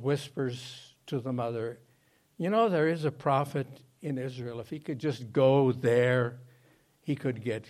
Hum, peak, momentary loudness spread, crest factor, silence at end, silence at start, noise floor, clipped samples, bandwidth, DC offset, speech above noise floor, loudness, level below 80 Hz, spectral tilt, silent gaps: none; -12 dBFS; 15 LU; 18 dB; 0.1 s; 0 s; -67 dBFS; under 0.1%; 14 kHz; under 0.1%; 38 dB; -30 LUFS; -72 dBFS; -7 dB/octave; none